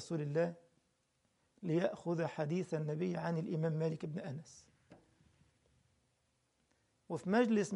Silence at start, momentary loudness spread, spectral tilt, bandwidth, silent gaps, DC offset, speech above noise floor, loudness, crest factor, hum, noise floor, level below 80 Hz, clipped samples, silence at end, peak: 0 s; 12 LU; -7 dB/octave; 11 kHz; none; under 0.1%; 43 dB; -38 LUFS; 20 dB; none; -79 dBFS; -80 dBFS; under 0.1%; 0 s; -20 dBFS